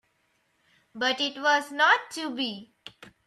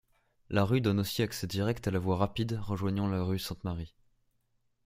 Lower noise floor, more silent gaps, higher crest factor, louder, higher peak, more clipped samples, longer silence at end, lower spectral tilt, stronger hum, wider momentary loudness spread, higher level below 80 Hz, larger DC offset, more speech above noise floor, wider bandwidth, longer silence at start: about the same, -71 dBFS vs -74 dBFS; neither; about the same, 20 dB vs 22 dB; first, -25 LUFS vs -32 LUFS; about the same, -8 dBFS vs -10 dBFS; neither; second, 0.2 s vs 1 s; second, -1.5 dB/octave vs -6.5 dB/octave; neither; first, 20 LU vs 9 LU; second, -78 dBFS vs -56 dBFS; neither; about the same, 45 dB vs 44 dB; second, 14 kHz vs 16 kHz; first, 0.95 s vs 0.5 s